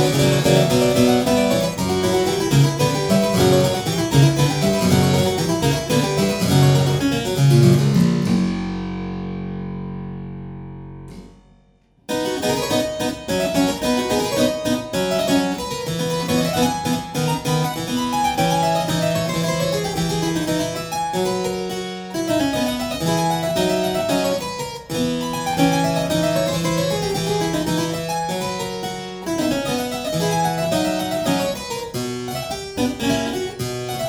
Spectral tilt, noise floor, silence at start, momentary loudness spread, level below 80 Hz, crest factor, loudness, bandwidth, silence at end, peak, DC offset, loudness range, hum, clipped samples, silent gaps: -5 dB/octave; -56 dBFS; 0 s; 11 LU; -44 dBFS; 18 dB; -20 LUFS; over 20 kHz; 0 s; -2 dBFS; under 0.1%; 6 LU; none; under 0.1%; none